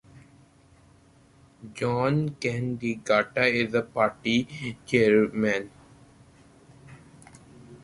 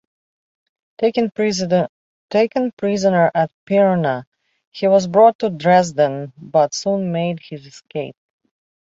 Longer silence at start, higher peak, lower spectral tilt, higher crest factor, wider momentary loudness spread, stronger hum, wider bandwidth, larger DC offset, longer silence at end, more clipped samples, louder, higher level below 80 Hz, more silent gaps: second, 0.15 s vs 1 s; second, -6 dBFS vs -2 dBFS; about the same, -6 dB/octave vs -5.5 dB/octave; first, 22 dB vs 16 dB; second, 10 LU vs 14 LU; neither; first, 11.5 kHz vs 8 kHz; neither; second, 0.05 s vs 0.8 s; neither; second, -25 LUFS vs -18 LUFS; about the same, -60 dBFS vs -62 dBFS; second, none vs 1.89-2.29 s, 2.73-2.77 s, 3.53-3.67 s, 4.27-4.32 s, 4.67-4.72 s, 5.35-5.39 s